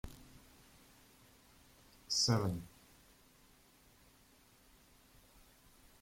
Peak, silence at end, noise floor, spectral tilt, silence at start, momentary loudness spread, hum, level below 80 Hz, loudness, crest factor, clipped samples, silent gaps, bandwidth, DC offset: -20 dBFS; 3.35 s; -66 dBFS; -4 dB/octave; 0.05 s; 31 LU; none; -64 dBFS; -35 LUFS; 26 dB; under 0.1%; none; 16.5 kHz; under 0.1%